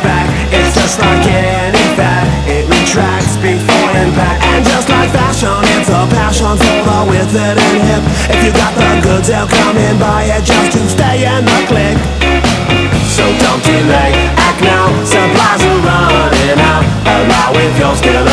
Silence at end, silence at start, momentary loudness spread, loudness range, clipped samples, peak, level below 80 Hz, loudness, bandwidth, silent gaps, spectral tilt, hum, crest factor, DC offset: 0 s; 0 s; 2 LU; 1 LU; 0.4%; 0 dBFS; -20 dBFS; -9 LUFS; 11 kHz; none; -4.5 dB/octave; none; 8 dB; under 0.1%